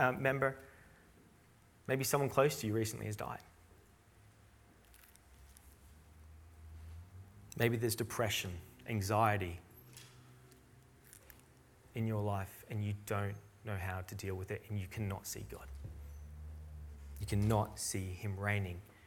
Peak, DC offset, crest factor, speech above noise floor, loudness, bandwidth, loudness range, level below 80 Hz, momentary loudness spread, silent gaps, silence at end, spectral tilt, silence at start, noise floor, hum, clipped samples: -14 dBFS; under 0.1%; 24 dB; 28 dB; -38 LUFS; 18 kHz; 8 LU; -58 dBFS; 24 LU; none; 0 s; -5 dB/octave; 0 s; -65 dBFS; none; under 0.1%